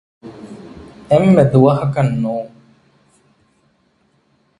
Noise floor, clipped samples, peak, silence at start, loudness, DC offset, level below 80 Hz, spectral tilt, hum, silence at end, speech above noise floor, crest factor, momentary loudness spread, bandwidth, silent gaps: -60 dBFS; under 0.1%; 0 dBFS; 0.25 s; -14 LUFS; under 0.1%; -48 dBFS; -9 dB/octave; none; 2.1 s; 47 dB; 18 dB; 25 LU; 10.5 kHz; none